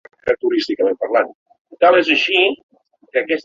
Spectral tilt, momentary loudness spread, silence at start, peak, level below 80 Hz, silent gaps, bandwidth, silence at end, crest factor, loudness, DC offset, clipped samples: -3.5 dB/octave; 9 LU; 0.25 s; -2 dBFS; -60 dBFS; 1.35-1.46 s, 1.59-1.65 s, 2.63-2.69 s; 7.4 kHz; 0.05 s; 16 dB; -16 LUFS; under 0.1%; under 0.1%